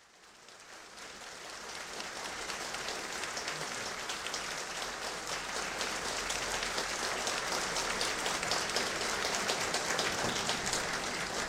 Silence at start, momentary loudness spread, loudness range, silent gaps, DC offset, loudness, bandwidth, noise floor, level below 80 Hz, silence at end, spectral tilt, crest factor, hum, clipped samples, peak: 0 s; 12 LU; 7 LU; none; under 0.1%; -34 LUFS; 16 kHz; -57 dBFS; -60 dBFS; 0 s; -1 dB/octave; 22 dB; none; under 0.1%; -14 dBFS